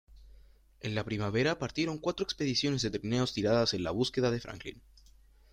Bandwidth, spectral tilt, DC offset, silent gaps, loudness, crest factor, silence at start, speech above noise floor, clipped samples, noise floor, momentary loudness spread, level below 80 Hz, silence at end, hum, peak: 15 kHz; -5 dB/octave; under 0.1%; none; -32 LUFS; 18 dB; 0.15 s; 28 dB; under 0.1%; -59 dBFS; 9 LU; -56 dBFS; 0.75 s; none; -16 dBFS